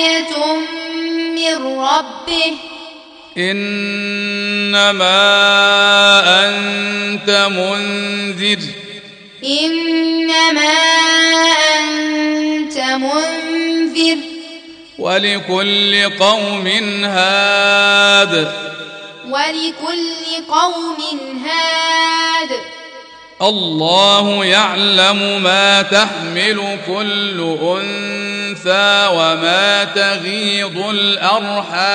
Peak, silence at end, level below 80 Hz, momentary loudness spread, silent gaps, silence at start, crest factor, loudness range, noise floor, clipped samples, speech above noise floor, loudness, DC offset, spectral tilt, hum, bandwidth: 0 dBFS; 0 s; -60 dBFS; 12 LU; none; 0 s; 14 dB; 7 LU; -37 dBFS; under 0.1%; 23 dB; -13 LUFS; under 0.1%; -2.5 dB/octave; none; 10.5 kHz